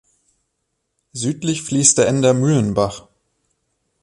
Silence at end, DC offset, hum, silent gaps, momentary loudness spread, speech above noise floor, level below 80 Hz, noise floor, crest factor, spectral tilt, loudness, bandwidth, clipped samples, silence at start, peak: 1.05 s; under 0.1%; none; none; 12 LU; 57 dB; -50 dBFS; -73 dBFS; 20 dB; -4.5 dB/octave; -17 LUFS; 11.5 kHz; under 0.1%; 1.15 s; 0 dBFS